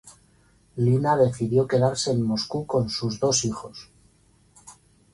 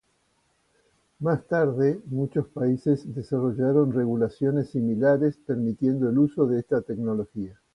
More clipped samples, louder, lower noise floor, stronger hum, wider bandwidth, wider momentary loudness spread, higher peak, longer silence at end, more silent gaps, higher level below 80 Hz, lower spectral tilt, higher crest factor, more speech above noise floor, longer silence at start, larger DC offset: neither; about the same, -23 LUFS vs -25 LUFS; second, -60 dBFS vs -69 dBFS; neither; first, 11.5 kHz vs 10 kHz; first, 14 LU vs 7 LU; first, -6 dBFS vs -10 dBFS; first, 0.45 s vs 0.2 s; neither; first, -54 dBFS vs -60 dBFS; second, -5 dB/octave vs -10 dB/octave; about the same, 18 dB vs 16 dB; second, 37 dB vs 45 dB; second, 0.05 s vs 1.2 s; neither